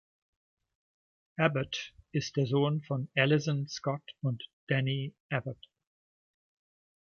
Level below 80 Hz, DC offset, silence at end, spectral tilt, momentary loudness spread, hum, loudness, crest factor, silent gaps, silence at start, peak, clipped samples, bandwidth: -70 dBFS; under 0.1%; 1.5 s; -6 dB/octave; 10 LU; none; -32 LUFS; 24 dB; 4.53-4.67 s, 5.20-5.29 s; 1.4 s; -10 dBFS; under 0.1%; 7 kHz